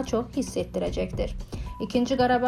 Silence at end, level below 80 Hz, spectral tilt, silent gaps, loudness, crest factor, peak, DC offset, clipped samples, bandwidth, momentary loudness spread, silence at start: 0 s; -38 dBFS; -5.5 dB/octave; none; -28 LUFS; 16 dB; -10 dBFS; under 0.1%; under 0.1%; 14 kHz; 11 LU; 0 s